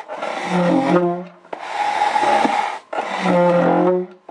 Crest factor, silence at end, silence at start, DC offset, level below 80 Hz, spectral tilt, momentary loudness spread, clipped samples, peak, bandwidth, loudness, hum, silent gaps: 18 dB; 0.15 s; 0 s; under 0.1%; -66 dBFS; -6.5 dB/octave; 11 LU; under 0.1%; -2 dBFS; 11 kHz; -18 LUFS; none; none